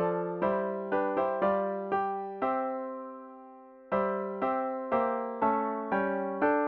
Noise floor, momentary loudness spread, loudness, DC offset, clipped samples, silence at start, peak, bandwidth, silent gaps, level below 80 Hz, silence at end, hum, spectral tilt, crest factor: -51 dBFS; 11 LU; -31 LUFS; under 0.1%; under 0.1%; 0 s; -14 dBFS; 5.4 kHz; none; -68 dBFS; 0 s; none; -9.5 dB/octave; 18 dB